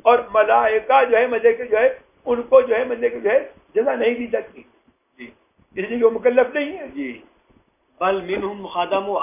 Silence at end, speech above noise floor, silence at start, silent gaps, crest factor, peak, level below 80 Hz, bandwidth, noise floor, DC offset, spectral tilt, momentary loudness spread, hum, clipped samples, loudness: 0 s; 40 dB; 0.05 s; none; 18 dB; -2 dBFS; -58 dBFS; 3.7 kHz; -59 dBFS; under 0.1%; -8 dB/octave; 12 LU; none; under 0.1%; -19 LUFS